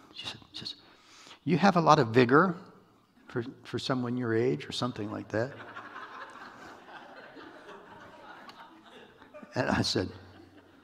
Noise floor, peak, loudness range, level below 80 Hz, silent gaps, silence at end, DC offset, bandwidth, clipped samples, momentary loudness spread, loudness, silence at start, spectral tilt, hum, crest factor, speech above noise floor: -61 dBFS; -4 dBFS; 20 LU; -64 dBFS; none; 0.55 s; under 0.1%; 13.5 kHz; under 0.1%; 26 LU; -29 LUFS; 0.15 s; -6 dB/octave; none; 26 dB; 34 dB